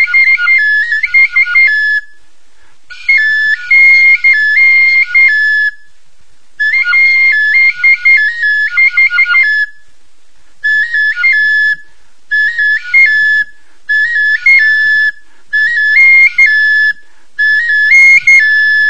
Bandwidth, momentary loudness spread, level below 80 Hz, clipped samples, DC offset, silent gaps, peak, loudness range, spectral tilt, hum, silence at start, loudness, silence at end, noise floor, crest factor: 9.6 kHz; 9 LU; -54 dBFS; 0.2%; 4%; none; 0 dBFS; 4 LU; 2 dB/octave; none; 0 s; -6 LUFS; 0 s; -52 dBFS; 10 dB